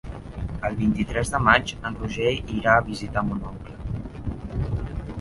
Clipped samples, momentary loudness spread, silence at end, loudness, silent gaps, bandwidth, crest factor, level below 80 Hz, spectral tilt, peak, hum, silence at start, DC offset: under 0.1%; 15 LU; 0 s; -25 LUFS; none; 11.5 kHz; 24 dB; -36 dBFS; -5.5 dB/octave; -2 dBFS; none; 0.05 s; under 0.1%